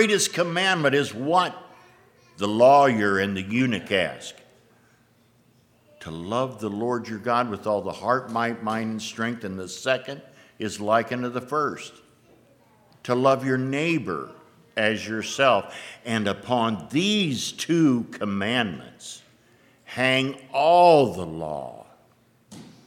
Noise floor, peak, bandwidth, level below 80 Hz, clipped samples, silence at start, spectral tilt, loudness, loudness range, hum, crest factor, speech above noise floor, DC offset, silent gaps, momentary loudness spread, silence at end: -60 dBFS; -4 dBFS; 16.5 kHz; -66 dBFS; under 0.1%; 0 s; -4.5 dB/octave; -23 LUFS; 7 LU; none; 20 dB; 37 dB; under 0.1%; none; 18 LU; 0.2 s